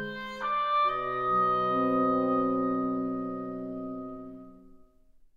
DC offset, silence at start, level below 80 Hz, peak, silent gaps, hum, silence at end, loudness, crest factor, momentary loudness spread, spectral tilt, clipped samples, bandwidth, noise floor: under 0.1%; 0 s; -60 dBFS; -16 dBFS; none; none; 0.6 s; -28 LUFS; 14 dB; 14 LU; -7.5 dB/octave; under 0.1%; 7.2 kHz; -58 dBFS